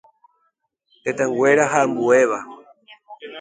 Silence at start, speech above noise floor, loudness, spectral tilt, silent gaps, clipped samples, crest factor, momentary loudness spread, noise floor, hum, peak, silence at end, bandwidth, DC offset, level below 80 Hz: 1.05 s; 52 dB; -18 LUFS; -4.5 dB/octave; none; under 0.1%; 18 dB; 21 LU; -70 dBFS; none; -2 dBFS; 0 s; 9.4 kHz; under 0.1%; -68 dBFS